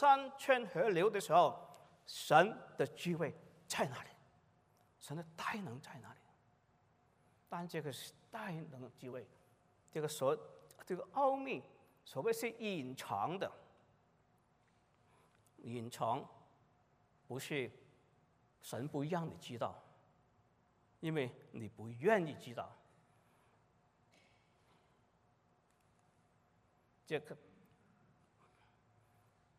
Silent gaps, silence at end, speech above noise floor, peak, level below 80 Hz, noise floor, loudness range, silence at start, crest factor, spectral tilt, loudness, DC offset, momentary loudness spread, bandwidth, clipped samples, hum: none; 2.25 s; 36 dB; -14 dBFS; -84 dBFS; -75 dBFS; 17 LU; 0 s; 26 dB; -5 dB/octave; -39 LUFS; under 0.1%; 20 LU; 15.5 kHz; under 0.1%; none